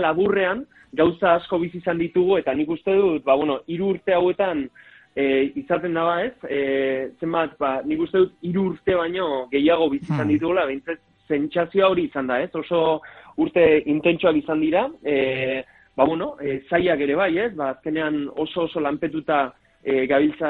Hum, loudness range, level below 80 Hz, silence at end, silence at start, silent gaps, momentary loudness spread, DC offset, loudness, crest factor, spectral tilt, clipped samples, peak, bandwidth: none; 3 LU; -56 dBFS; 0 s; 0 s; none; 8 LU; under 0.1%; -22 LUFS; 18 dB; -8.5 dB/octave; under 0.1%; -2 dBFS; 4.4 kHz